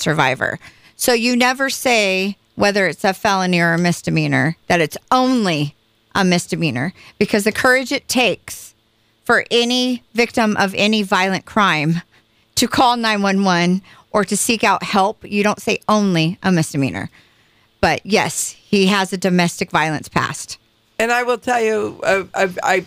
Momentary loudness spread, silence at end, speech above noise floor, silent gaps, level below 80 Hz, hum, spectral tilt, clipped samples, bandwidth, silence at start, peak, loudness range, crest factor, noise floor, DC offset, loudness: 8 LU; 0 s; 43 dB; none; -50 dBFS; none; -4 dB/octave; under 0.1%; 16 kHz; 0 s; -2 dBFS; 2 LU; 16 dB; -60 dBFS; under 0.1%; -17 LUFS